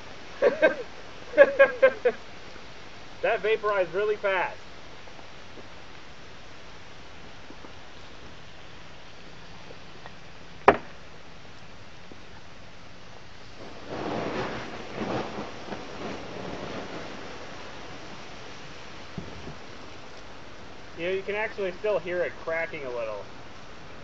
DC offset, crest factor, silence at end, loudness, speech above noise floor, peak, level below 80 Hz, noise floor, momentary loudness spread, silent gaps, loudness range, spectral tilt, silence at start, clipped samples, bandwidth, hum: 0.9%; 30 dB; 0 s; -27 LUFS; 23 dB; 0 dBFS; -56 dBFS; -48 dBFS; 24 LU; none; 21 LU; -2.5 dB/octave; 0 s; under 0.1%; 7.8 kHz; none